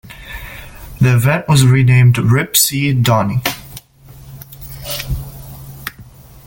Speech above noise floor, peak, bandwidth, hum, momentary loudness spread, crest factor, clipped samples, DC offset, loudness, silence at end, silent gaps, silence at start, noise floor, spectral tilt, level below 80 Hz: 28 dB; 0 dBFS; 17 kHz; none; 23 LU; 16 dB; under 0.1%; under 0.1%; -13 LUFS; 0.45 s; none; 0.05 s; -39 dBFS; -5 dB/octave; -36 dBFS